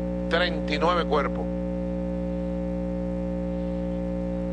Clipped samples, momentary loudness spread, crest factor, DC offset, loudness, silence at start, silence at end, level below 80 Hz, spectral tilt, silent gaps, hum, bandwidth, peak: under 0.1%; 6 LU; 16 dB; under 0.1%; -27 LUFS; 0 s; 0 s; -36 dBFS; -7.5 dB/octave; none; 60 Hz at -30 dBFS; 9 kHz; -10 dBFS